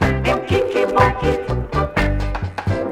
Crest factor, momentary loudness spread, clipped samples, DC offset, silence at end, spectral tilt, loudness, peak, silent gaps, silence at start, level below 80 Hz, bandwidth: 16 dB; 7 LU; under 0.1%; under 0.1%; 0 s; -7 dB/octave; -19 LUFS; -2 dBFS; none; 0 s; -26 dBFS; 15 kHz